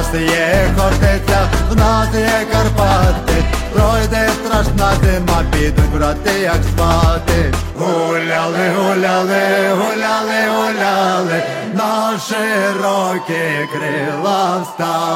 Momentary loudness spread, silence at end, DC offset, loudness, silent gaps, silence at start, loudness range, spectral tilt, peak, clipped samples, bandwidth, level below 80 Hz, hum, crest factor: 5 LU; 0 s; under 0.1%; -15 LUFS; none; 0 s; 2 LU; -5.5 dB/octave; -4 dBFS; under 0.1%; 16.5 kHz; -20 dBFS; none; 10 dB